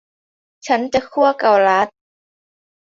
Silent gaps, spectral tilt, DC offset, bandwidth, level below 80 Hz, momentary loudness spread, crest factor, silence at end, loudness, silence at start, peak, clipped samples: none; -4 dB/octave; under 0.1%; 7.6 kHz; -58 dBFS; 9 LU; 16 dB; 1 s; -16 LUFS; 0.65 s; -2 dBFS; under 0.1%